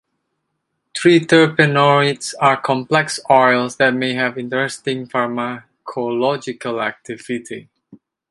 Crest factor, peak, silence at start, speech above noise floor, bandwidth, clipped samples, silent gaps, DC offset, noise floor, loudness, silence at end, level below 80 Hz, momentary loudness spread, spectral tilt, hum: 18 dB; 0 dBFS; 0.95 s; 57 dB; 11.5 kHz; under 0.1%; none; under 0.1%; -73 dBFS; -17 LUFS; 0.7 s; -64 dBFS; 14 LU; -5 dB/octave; none